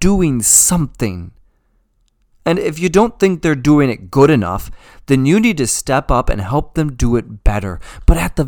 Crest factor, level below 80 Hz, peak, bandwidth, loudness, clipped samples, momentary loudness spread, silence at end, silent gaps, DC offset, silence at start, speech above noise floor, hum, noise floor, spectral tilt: 14 dB; -24 dBFS; 0 dBFS; 19.5 kHz; -14 LUFS; 0.1%; 12 LU; 0 s; none; under 0.1%; 0 s; 45 dB; none; -59 dBFS; -5 dB/octave